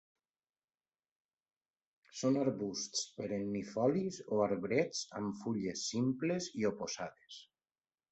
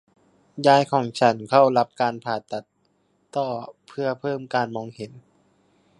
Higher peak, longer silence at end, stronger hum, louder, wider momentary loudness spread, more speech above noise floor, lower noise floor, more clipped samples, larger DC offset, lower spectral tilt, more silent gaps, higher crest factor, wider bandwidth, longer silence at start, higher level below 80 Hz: second, -18 dBFS vs -2 dBFS; about the same, 0.7 s vs 0.8 s; neither; second, -37 LUFS vs -22 LUFS; second, 9 LU vs 18 LU; first, over 54 dB vs 45 dB; first, under -90 dBFS vs -67 dBFS; neither; neither; about the same, -4.5 dB/octave vs -5.5 dB/octave; neither; about the same, 20 dB vs 22 dB; second, 8.2 kHz vs 11 kHz; first, 2.15 s vs 0.55 s; about the same, -74 dBFS vs -70 dBFS